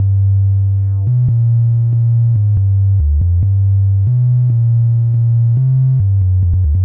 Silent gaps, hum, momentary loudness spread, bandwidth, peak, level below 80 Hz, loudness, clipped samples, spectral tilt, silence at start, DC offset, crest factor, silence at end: none; none; 1 LU; 1.1 kHz; -6 dBFS; -24 dBFS; -13 LUFS; under 0.1%; -15 dB/octave; 0 s; under 0.1%; 4 dB; 0 s